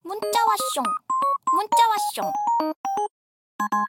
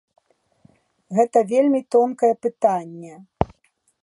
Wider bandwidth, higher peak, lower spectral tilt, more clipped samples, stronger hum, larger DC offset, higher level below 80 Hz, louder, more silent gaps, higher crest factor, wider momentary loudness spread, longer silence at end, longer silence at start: first, 17 kHz vs 11.5 kHz; second, -8 dBFS vs 0 dBFS; second, -2 dB/octave vs -7.5 dB/octave; neither; neither; neither; second, -76 dBFS vs -46 dBFS; second, -23 LUFS vs -20 LUFS; first, 2.76-2.84 s, 3.10-3.59 s vs none; second, 16 dB vs 22 dB; second, 8 LU vs 14 LU; second, 0 s vs 0.6 s; second, 0.05 s vs 1.1 s